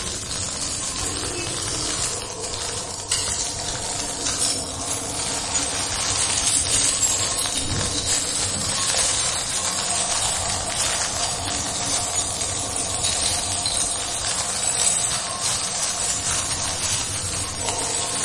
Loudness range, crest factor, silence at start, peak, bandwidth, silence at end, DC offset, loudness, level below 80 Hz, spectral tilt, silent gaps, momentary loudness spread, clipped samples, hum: 4 LU; 18 dB; 0 s; -6 dBFS; 11.5 kHz; 0 s; under 0.1%; -21 LUFS; -44 dBFS; -1 dB/octave; none; 7 LU; under 0.1%; none